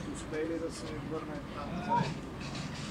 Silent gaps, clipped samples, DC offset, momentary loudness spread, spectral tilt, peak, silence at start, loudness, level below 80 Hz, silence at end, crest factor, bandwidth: none; under 0.1%; under 0.1%; 8 LU; -5.5 dB/octave; -20 dBFS; 0 s; -37 LUFS; -52 dBFS; 0 s; 16 dB; 16 kHz